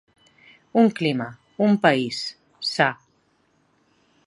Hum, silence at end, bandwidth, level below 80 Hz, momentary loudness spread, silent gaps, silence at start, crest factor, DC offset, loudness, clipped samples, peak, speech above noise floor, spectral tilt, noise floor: none; 1.35 s; 11.5 kHz; -72 dBFS; 13 LU; none; 0.75 s; 22 dB; under 0.1%; -22 LUFS; under 0.1%; -2 dBFS; 44 dB; -5.5 dB/octave; -65 dBFS